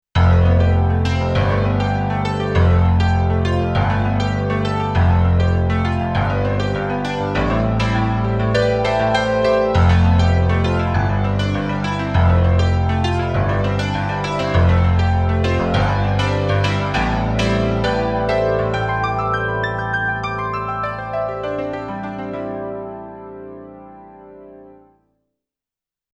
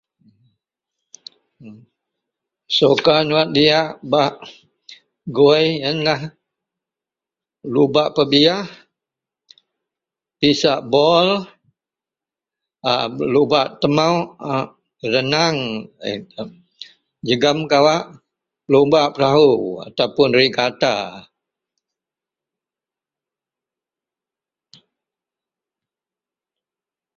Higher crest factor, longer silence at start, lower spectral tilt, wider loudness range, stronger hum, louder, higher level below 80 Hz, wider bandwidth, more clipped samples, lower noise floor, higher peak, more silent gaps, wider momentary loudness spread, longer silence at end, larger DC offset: second, 14 dB vs 20 dB; second, 0.15 s vs 1.65 s; first, -7.5 dB/octave vs -5 dB/octave; first, 9 LU vs 4 LU; neither; about the same, -18 LUFS vs -17 LUFS; first, -28 dBFS vs -58 dBFS; about the same, 8 kHz vs 7.4 kHz; neither; about the same, -90 dBFS vs -90 dBFS; second, -4 dBFS vs 0 dBFS; neither; second, 9 LU vs 14 LU; second, 1.45 s vs 5.95 s; neither